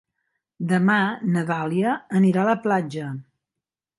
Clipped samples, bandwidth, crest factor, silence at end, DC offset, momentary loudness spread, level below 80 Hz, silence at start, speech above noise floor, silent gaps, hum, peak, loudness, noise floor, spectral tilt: under 0.1%; 11.5 kHz; 16 dB; 0.75 s; under 0.1%; 13 LU; -70 dBFS; 0.6 s; 66 dB; none; none; -8 dBFS; -22 LUFS; -87 dBFS; -7.5 dB/octave